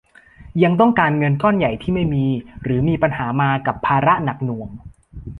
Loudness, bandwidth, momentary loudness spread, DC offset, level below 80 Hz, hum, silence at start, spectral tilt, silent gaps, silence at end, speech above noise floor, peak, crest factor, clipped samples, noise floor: -18 LUFS; 4.3 kHz; 11 LU; under 0.1%; -42 dBFS; none; 0.4 s; -9.5 dB/octave; none; 0 s; 26 dB; -2 dBFS; 16 dB; under 0.1%; -43 dBFS